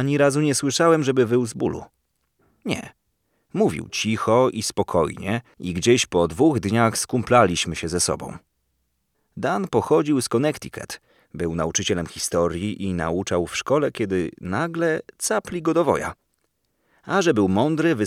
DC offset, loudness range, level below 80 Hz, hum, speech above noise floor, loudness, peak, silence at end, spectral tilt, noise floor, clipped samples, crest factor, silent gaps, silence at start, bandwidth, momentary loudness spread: under 0.1%; 4 LU; -50 dBFS; none; 51 dB; -22 LUFS; -2 dBFS; 0 s; -4.5 dB/octave; -72 dBFS; under 0.1%; 20 dB; none; 0 s; 16 kHz; 10 LU